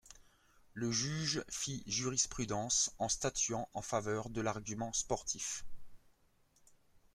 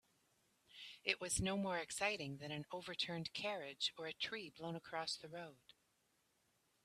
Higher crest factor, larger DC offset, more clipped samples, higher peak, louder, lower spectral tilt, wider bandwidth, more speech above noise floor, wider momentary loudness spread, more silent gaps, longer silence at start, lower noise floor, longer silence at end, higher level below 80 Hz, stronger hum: second, 20 dB vs 26 dB; neither; neither; about the same, -20 dBFS vs -20 dBFS; first, -36 LUFS vs -43 LUFS; about the same, -3 dB/octave vs -3 dB/octave; first, 15.5 kHz vs 14 kHz; about the same, 34 dB vs 36 dB; second, 8 LU vs 14 LU; neither; second, 0.05 s vs 0.7 s; second, -71 dBFS vs -81 dBFS; second, 0.15 s vs 1.3 s; first, -60 dBFS vs -68 dBFS; neither